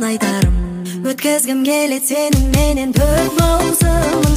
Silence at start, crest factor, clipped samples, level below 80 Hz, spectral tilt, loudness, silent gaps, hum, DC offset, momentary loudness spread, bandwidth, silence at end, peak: 0 s; 14 dB; under 0.1%; -20 dBFS; -5 dB/octave; -15 LUFS; none; none; under 0.1%; 5 LU; 16 kHz; 0 s; 0 dBFS